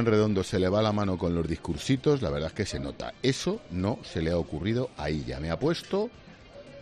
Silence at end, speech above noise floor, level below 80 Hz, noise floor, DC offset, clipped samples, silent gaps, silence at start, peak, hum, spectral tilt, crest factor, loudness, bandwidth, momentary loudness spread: 0 s; 20 dB; -48 dBFS; -48 dBFS; under 0.1%; under 0.1%; none; 0 s; -10 dBFS; none; -6 dB/octave; 18 dB; -29 LUFS; 13 kHz; 8 LU